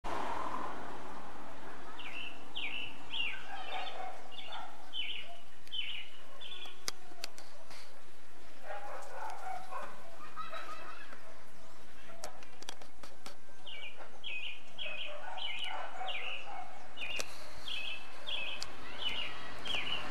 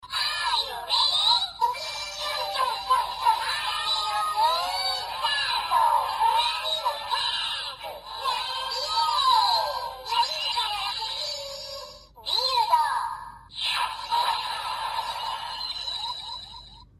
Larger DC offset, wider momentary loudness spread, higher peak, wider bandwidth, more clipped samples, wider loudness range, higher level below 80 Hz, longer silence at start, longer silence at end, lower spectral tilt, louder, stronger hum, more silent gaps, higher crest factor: first, 3% vs under 0.1%; first, 15 LU vs 12 LU; second, -14 dBFS vs -10 dBFS; second, 13 kHz vs 15 kHz; neither; first, 8 LU vs 3 LU; about the same, -62 dBFS vs -58 dBFS; about the same, 0.05 s vs 0 s; second, 0 s vs 0.15 s; first, -2.5 dB/octave vs 0.5 dB/octave; second, -42 LUFS vs -25 LUFS; neither; neither; first, 28 dB vs 18 dB